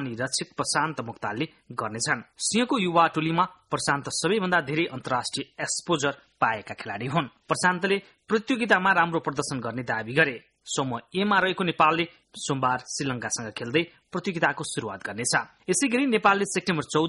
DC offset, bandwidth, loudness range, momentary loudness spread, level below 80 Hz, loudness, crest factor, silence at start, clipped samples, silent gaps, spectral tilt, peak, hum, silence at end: under 0.1%; 11.5 kHz; 3 LU; 10 LU; -64 dBFS; -26 LUFS; 20 dB; 0 s; under 0.1%; none; -3.5 dB/octave; -6 dBFS; none; 0 s